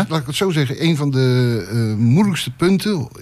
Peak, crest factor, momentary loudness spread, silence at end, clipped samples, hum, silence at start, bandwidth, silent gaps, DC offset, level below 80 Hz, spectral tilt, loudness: -4 dBFS; 12 dB; 5 LU; 0 s; under 0.1%; none; 0 s; 14.5 kHz; none; under 0.1%; -50 dBFS; -6.5 dB/octave; -17 LUFS